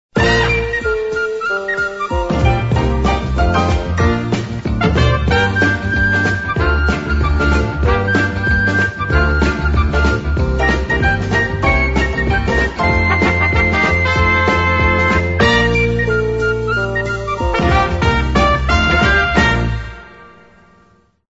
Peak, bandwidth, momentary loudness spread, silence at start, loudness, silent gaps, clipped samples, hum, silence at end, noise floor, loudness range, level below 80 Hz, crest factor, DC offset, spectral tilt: 0 dBFS; 8 kHz; 6 LU; 0.15 s; -15 LUFS; none; under 0.1%; none; 0.95 s; -52 dBFS; 3 LU; -22 dBFS; 14 dB; 0.6%; -6 dB/octave